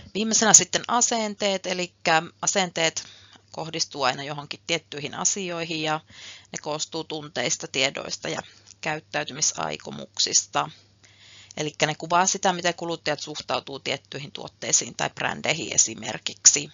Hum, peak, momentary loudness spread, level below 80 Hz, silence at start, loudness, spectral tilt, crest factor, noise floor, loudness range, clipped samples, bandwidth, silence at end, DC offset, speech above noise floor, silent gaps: none; 0 dBFS; 14 LU; -68 dBFS; 0 s; -24 LUFS; -1.5 dB/octave; 26 dB; -53 dBFS; 6 LU; under 0.1%; 8 kHz; 0 s; under 0.1%; 27 dB; none